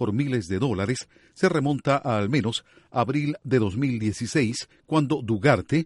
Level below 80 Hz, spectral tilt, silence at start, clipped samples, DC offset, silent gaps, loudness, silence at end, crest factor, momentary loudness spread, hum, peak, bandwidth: -56 dBFS; -6 dB/octave; 0 s; under 0.1%; under 0.1%; none; -25 LUFS; 0 s; 18 dB; 7 LU; none; -6 dBFS; 11.5 kHz